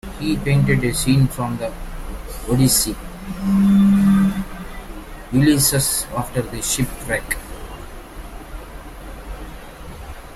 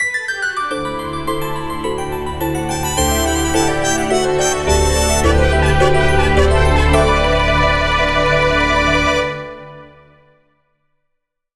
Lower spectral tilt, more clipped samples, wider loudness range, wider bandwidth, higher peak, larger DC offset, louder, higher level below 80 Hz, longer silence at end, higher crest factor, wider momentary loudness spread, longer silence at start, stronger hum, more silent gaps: about the same, -5 dB/octave vs -4 dB/octave; neither; first, 10 LU vs 5 LU; first, 16 kHz vs 12.5 kHz; second, -4 dBFS vs 0 dBFS; second, under 0.1% vs 0.7%; second, -18 LUFS vs -15 LUFS; second, -34 dBFS vs -22 dBFS; second, 0 s vs 1.7 s; about the same, 16 dB vs 16 dB; first, 22 LU vs 9 LU; about the same, 0.05 s vs 0 s; neither; neither